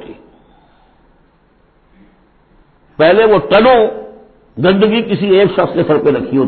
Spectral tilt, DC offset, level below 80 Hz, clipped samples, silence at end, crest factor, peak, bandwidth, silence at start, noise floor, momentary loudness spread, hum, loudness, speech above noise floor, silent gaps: -9.5 dB/octave; under 0.1%; -46 dBFS; under 0.1%; 0 s; 14 dB; 0 dBFS; 4.5 kHz; 0 s; -52 dBFS; 7 LU; none; -11 LUFS; 42 dB; none